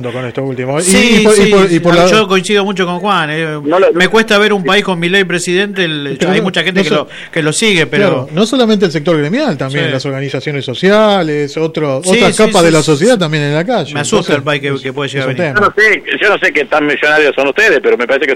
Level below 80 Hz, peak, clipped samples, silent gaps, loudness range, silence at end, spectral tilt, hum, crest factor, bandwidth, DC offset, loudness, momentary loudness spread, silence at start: -42 dBFS; 0 dBFS; under 0.1%; none; 3 LU; 0 s; -4.5 dB/octave; none; 10 dB; 16 kHz; under 0.1%; -10 LUFS; 8 LU; 0 s